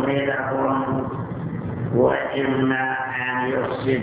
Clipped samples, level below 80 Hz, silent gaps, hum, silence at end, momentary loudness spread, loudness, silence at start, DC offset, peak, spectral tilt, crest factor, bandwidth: under 0.1%; -50 dBFS; none; none; 0 s; 9 LU; -23 LUFS; 0 s; under 0.1%; -6 dBFS; -10.5 dB/octave; 16 dB; 4 kHz